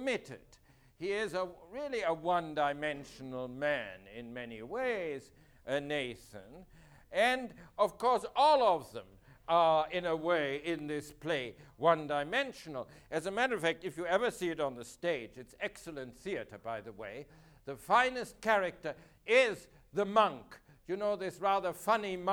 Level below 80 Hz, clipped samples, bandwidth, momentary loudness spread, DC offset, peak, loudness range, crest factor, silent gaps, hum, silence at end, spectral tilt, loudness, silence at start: -66 dBFS; under 0.1%; 20 kHz; 17 LU; under 0.1%; -14 dBFS; 7 LU; 22 dB; none; none; 0 s; -4.5 dB/octave; -33 LUFS; 0 s